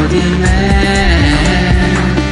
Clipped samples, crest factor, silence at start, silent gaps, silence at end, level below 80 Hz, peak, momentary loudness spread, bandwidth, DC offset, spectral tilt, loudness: under 0.1%; 10 dB; 0 s; none; 0 s; -16 dBFS; 0 dBFS; 2 LU; 11 kHz; under 0.1%; -5.5 dB/octave; -11 LUFS